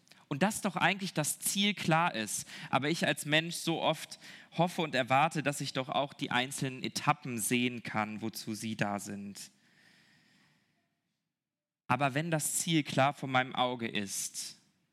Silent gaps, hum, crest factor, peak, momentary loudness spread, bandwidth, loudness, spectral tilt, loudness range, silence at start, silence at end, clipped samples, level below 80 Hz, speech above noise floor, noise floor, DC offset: none; none; 24 dB; -10 dBFS; 10 LU; 16 kHz; -32 LUFS; -3.5 dB/octave; 9 LU; 0.3 s; 0.4 s; under 0.1%; -80 dBFS; over 57 dB; under -90 dBFS; under 0.1%